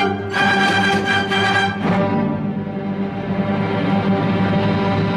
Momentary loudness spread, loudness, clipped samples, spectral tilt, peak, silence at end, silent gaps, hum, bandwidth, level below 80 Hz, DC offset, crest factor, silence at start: 8 LU; -18 LUFS; under 0.1%; -6 dB/octave; -4 dBFS; 0 s; none; none; 11.5 kHz; -48 dBFS; under 0.1%; 14 dB; 0 s